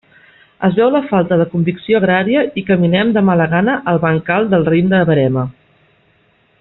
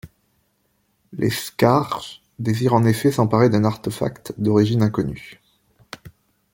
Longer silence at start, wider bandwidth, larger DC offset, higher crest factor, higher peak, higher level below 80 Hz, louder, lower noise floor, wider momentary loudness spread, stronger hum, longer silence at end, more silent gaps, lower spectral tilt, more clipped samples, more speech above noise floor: first, 0.6 s vs 0.05 s; second, 4.1 kHz vs 17 kHz; neither; second, 12 dB vs 18 dB; about the same, -2 dBFS vs -2 dBFS; about the same, -50 dBFS vs -52 dBFS; first, -14 LUFS vs -20 LUFS; second, -55 dBFS vs -67 dBFS; second, 4 LU vs 20 LU; neither; first, 1.1 s vs 0.45 s; neither; about the same, -6 dB/octave vs -7 dB/octave; neither; second, 42 dB vs 48 dB